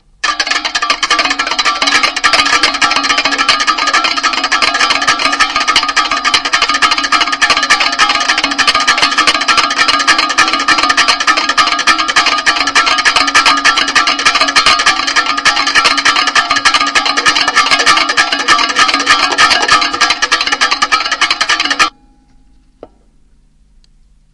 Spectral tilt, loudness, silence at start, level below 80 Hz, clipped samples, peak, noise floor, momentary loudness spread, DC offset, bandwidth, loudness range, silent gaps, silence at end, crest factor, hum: 0.5 dB/octave; -9 LUFS; 0.25 s; -42 dBFS; 0.5%; 0 dBFS; -47 dBFS; 3 LU; under 0.1%; 12 kHz; 2 LU; none; 2.45 s; 12 dB; none